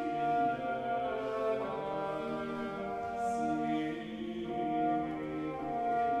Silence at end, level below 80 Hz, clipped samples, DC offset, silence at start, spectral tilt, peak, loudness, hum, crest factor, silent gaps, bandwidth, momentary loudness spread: 0 s; -62 dBFS; under 0.1%; under 0.1%; 0 s; -6.5 dB/octave; -20 dBFS; -35 LUFS; none; 14 dB; none; 11 kHz; 6 LU